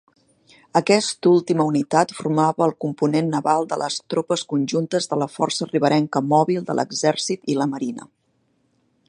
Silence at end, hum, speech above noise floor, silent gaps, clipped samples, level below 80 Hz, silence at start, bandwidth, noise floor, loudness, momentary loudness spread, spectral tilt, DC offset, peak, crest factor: 1.05 s; none; 46 dB; none; under 0.1%; -70 dBFS; 0.75 s; 11 kHz; -66 dBFS; -21 LUFS; 6 LU; -5 dB/octave; under 0.1%; -2 dBFS; 20 dB